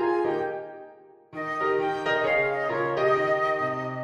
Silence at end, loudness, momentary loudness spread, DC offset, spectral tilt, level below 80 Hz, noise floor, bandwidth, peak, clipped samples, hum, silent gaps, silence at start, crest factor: 0 s; -25 LUFS; 13 LU; under 0.1%; -6 dB/octave; -62 dBFS; -50 dBFS; 11 kHz; -12 dBFS; under 0.1%; none; none; 0 s; 14 dB